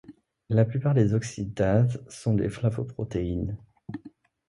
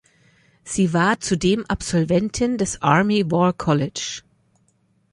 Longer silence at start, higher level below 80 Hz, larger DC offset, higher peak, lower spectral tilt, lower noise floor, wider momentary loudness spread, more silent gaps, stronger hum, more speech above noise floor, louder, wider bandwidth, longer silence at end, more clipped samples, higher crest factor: second, 0.1 s vs 0.65 s; about the same, -46 dBFS vs -46 dBFS; neither; second, -8 dBFS vs -2 dBFS; first, -8 dB/octave vs -5 dB/octave; second, -52 dBFS vs -63 dBFS; first, 18 LU vs 9 LU; neither; neither; second, 26 dB vs 44 dB; second, -27 LUFS vs -20 LUFS; about the same, 11.5 kHz vs 11 kHz; second, 0.4 s vs 0.95 s; neither; about the same, 18 dB vs 18 dB